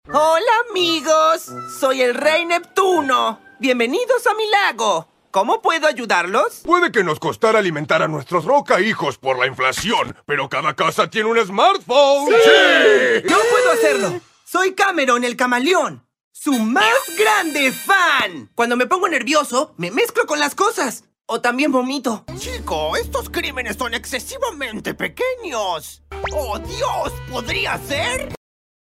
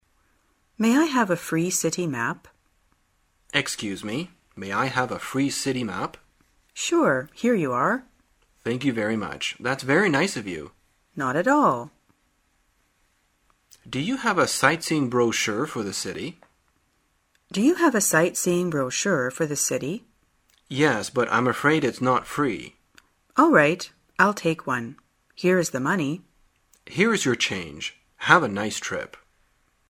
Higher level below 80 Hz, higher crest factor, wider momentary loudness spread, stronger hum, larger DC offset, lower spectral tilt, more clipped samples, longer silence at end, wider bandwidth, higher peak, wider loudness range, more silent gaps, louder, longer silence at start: first, -46 dBFS vs -62 dBFS; second, 18 dB vs 24 dB; second, 10 LU vs 14 LU; neither; neither; about the same, -3 dB/octave vs -4 dB/octave; neither; second, 0.5 s vs 0.75 s; about the same, 16 kHz vs 16 kHz; about the same, 0 dBFS vs 0 dBFS; first, 10 LU vs 5 LU; first, 16.24-16.31 s vs none; first, -17 LUFS vs -23 LUFS; second, 0.1 s vs 0.8 s